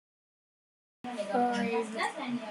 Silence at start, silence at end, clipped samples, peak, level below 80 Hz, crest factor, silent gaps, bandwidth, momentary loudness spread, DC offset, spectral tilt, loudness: 1.05 s; 0 s; under 0.1%; -16 dBFS; -82 dBFS; 18 dB; none; 12 kHz; 11 LU; under 0.1%; -5 dB/octave; -32 LUFS